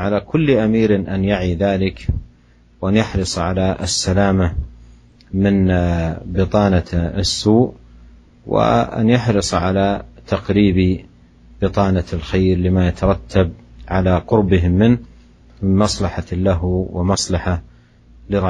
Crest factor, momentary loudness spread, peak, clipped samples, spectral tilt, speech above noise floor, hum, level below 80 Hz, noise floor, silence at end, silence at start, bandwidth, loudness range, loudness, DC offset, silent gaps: 16 dB; 8 LU; -2 dBFS; under 0.1%; -6 dB/octave; 34 dB; none; -32 dBFS; -50 dBFS; 0 s; 0 s; 11 kHz; 2 LU; -17 LUFS; under 0.1%; none